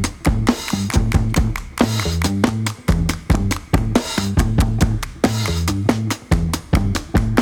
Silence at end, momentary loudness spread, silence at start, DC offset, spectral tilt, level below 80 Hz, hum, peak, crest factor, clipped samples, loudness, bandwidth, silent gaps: 0 s; 2 LU; 0 s; under 0.1%; -5.5 dB/octave; -24 dBFS; none; 0 dBFS; 18 dB; under 0.1%; -19 LUFS; 18.5 kHz; none